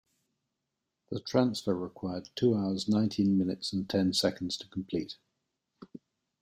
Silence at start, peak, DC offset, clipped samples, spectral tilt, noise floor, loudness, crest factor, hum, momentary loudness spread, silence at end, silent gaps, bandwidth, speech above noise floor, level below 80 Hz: 1.1 s; -10 dBFS; under 0.1%; under 0.1%; -6 dB/octave; -85 dBFS; -31 LUFS; 22 dB; none; 15 LU; 0.45 s; none; 14.5 kHz; 55 dB; -68 dBFS